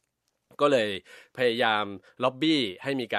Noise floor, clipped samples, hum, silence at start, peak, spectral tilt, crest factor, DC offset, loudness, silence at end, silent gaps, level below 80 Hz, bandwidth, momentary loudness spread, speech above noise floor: -78 dBFS; under 0.1%; none; 0.6 s; -8 dBFS; -5 dB/octave; 20 dB; under 0.1%; -26 LUFS; 0 s; none; -76 dBFS; 13.5 kHz; 11 LU; 51 dB